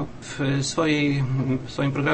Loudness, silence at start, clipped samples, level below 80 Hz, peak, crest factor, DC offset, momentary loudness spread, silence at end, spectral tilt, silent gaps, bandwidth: -24 LUFS; 0 s; under 0.1%; -48 dBFS; -8 dBFS; 16 dB; under 0.1%; 6 LU; 0 s; -5.5 dB/octave; none; 8.8 kHz